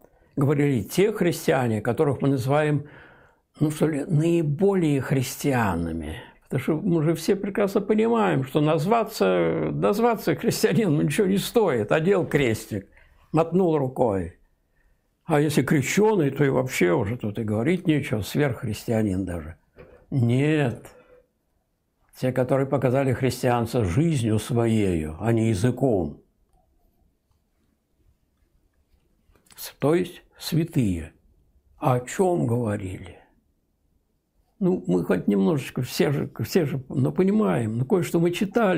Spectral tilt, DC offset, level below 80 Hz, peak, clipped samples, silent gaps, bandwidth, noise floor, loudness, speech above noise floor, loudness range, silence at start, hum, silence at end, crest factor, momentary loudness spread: -6.5 dB/octave; under 0.1%; -54 dBFS; -6 dBFS; under 0.1%; none; 16 kHz; -71 dBFS; -23 LUFS; 49 dB; 6 LU; 0.35 s; none; 0 s; 18 dB; 8 LU